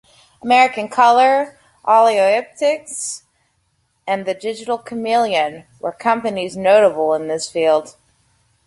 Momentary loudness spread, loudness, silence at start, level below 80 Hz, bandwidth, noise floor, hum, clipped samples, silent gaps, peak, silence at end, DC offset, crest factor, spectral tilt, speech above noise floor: 14 LU; -17 LUFS; 0.45 s; -64 dBFS; 11.5 kHz; -65 dBFS; none; under 0.1%; none; 0 dBFS; 0.75 s; under 0.1%; 16 dB; -3 dB/octave; 49 dB